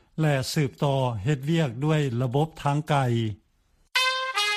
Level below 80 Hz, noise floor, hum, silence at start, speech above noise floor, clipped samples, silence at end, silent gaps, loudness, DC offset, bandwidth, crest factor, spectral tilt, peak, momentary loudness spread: -56 dBFS; -65 dBFS; none; 0.15 s; 41 dB; under 0.1%; 0 s; none; -25 LUFS; under 0.1%; 14.5 kHz; 18 dB; -5.5 dB/octave; -8 dBFS; 4 LU